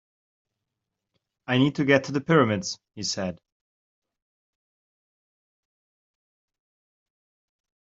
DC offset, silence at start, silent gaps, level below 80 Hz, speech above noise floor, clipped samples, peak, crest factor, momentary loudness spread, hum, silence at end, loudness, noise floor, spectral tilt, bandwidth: under 0.1%; 1.5 s; none; -68 dBFS; 61 dB; under 0.1%; -4 dBFS; 24 dB; 13 LU; none; 4.65 s; -24 LUFS; -85 dBFS; -5 dB/octave; 7.8 kHz